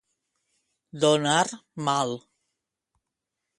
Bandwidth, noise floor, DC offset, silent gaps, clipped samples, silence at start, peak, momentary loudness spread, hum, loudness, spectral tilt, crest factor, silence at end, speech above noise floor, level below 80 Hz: 11.5 kHz; -85 dBFS; under 0.1%; none; under 0.1%; 0.95 s; -8 dBFS; 10 LU; none; -25 LUFS; -3.5 dB/octave; 22 dB; 1.4 s; 60 dB; -72 dBFS